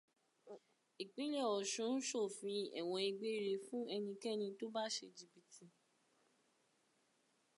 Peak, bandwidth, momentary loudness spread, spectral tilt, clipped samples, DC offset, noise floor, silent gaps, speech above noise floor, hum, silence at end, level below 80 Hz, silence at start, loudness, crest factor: -28 dBFS; 11.5 kHz; 20 LU; -3 dB/octave; under 0.1%; under 0.1%; -79 dBFS; none; 37 dB; none; 1.9 s; under -90 dBFS; 0.45 s; -43 LUFS; 16 dB